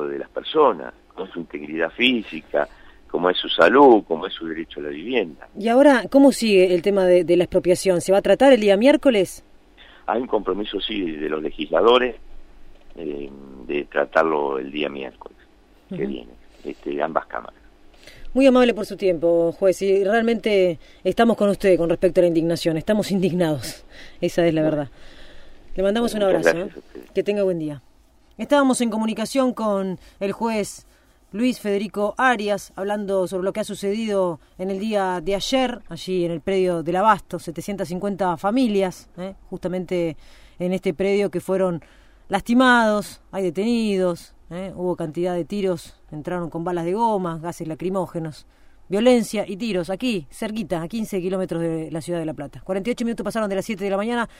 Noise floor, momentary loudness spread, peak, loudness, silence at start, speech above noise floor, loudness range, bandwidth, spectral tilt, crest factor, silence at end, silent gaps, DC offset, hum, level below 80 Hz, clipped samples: -54 dBFS; 16 LU; -2 dBFS; -21 LUFS; 0 s; 33 dB; 8 LU; 16 kHz; -5.5 dB/octave; 18 dB; 0.1 s; none; under 0.1%; none; -48 dBFS; under 0.1%